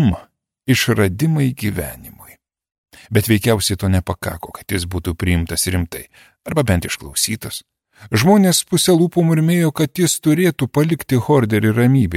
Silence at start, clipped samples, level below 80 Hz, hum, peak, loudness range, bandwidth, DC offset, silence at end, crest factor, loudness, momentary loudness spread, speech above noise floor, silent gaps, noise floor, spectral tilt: 0 s; under 0.1%; -38 dBFS; none; -2 dBFS; 5 LU; 16.5 kHz; under 0.1%; 0 s; 16 dB; -17 LUFS; 13 LU; 31 dB; 2.78-2.84 s; -47 dBFS; -5 dB/octave